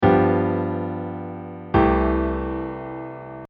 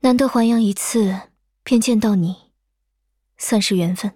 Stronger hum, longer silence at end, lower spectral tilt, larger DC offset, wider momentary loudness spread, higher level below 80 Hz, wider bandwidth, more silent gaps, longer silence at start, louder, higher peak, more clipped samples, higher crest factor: neither; about the same, 0.05 s vs 0.05 s; first, -7 dB/octave vs -5 dB/octave; neither; first, 16 LU vs 12 LU; first, -34 dBFS vs -56 dBFS; second, 5.2 kHz vs 16.5 kHz; neither; about the same, 0 s vs 0.05 s; second, -22 LUFS vs -18 LUFS; about the same, -4 dBFS vs -4 dBFS; neither; about the same, 18 dB vs 14 dB